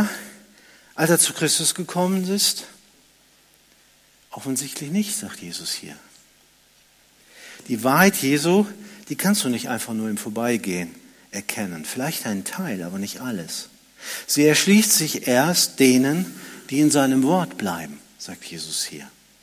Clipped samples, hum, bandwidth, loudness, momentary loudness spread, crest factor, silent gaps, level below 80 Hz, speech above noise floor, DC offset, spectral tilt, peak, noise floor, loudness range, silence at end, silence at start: under 0.1%; none; 16 kHz; -21 LUFS; 19 LU; 20 dB; none; -66 dBFS; 35 dB; under 0.1%; -3.5 dB/octave; -2 dBFS; -57 dBFS; 11 LU; 0.35 s; 0 s